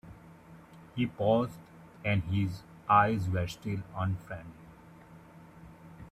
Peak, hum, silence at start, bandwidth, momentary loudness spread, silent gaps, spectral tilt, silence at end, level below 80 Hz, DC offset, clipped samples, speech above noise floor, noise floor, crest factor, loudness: -10 dBFS; none; 0.05 s; 14 kHz; 27 LU; none; -7.5 dB/octave; 0.05 s; -58 dBFS; under 0.1%; under 0.1%; 23 dB; -53 dBFS; 24 dB; -31 LUFS